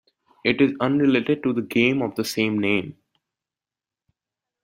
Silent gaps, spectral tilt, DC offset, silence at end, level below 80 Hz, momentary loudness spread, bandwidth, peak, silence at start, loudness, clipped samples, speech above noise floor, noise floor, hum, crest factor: none; -5.5 dB/octave; under 0.1%; 1.7 s; -62 dBFS; 6 LU; 16 kHz; -6 dBFS; 0.45 s; -22 LUFS; under 0.1%; over 69 dB; under -90 dBFS; none; 18 dB